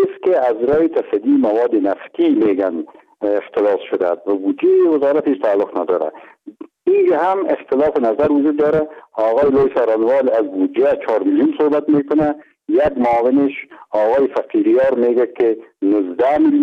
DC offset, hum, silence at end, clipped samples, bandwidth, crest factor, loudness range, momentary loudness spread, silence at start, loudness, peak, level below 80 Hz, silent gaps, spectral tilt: under 0.1%; none; 0 s; under 0.1%; 5.4 kHz; 10 dB; 2 LU; 6 LU; 0 s; -16 LUFS; -6 dBFS; -52 dBFS; none; -8.5 dB/octave